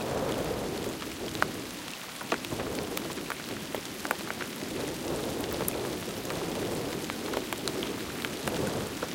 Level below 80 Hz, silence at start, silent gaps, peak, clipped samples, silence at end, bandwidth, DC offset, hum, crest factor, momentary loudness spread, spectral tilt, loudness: -54 dBFS; 0 s; none; -4 dBFS; under 0.1%; 0 s; 17 kHz; under 0.1%; none; 30 dB; 4 LU; -3.5 dB/octave; -34 LUFS